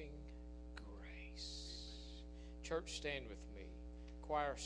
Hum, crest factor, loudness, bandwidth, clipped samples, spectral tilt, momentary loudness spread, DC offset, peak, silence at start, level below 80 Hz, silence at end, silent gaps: 60 Hz at -55 dBFS; 20 dB; -49 LUFS; 10.5 kHz; under 0.1%; -4 dB/octave; 12 LU; under 0.1%; -28 dBFS; 0 s; -54 dBFS; 0 s; none